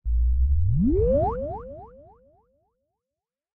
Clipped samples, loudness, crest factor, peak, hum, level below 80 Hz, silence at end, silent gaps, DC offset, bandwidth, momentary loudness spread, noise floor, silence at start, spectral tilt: under 0.1%; -24 LUFS; 14 dB; -10 dBFS; none; -28 dBFS; 1.7 s; none; under 0.1%; 1.6 kHz; 17 LU; -89 dBFS; 0.05 s; -14 dB/octave